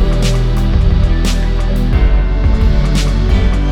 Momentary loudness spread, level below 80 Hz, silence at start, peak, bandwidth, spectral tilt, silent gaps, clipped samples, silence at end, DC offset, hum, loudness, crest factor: 3 LU; -12 dBFS; 0 s; -2 dBFS; 11 kHz; -6.5 dB/octave; none; under 0.1%; 0 s; under 0.1%; none; -14 LUFS; 10 dB